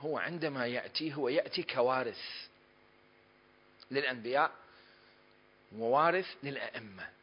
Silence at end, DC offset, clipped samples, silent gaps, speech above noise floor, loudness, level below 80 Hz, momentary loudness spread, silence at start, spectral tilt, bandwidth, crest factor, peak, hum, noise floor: 0.1 s; under 0.1%; under 0.1%; none; 31 dB; -34 LUFS; -80 dBFS; 14 LU; 0 s; -8 dB/octave; 5.4 kHz; 20 dB; -16 dBFS; none; -64 dBFS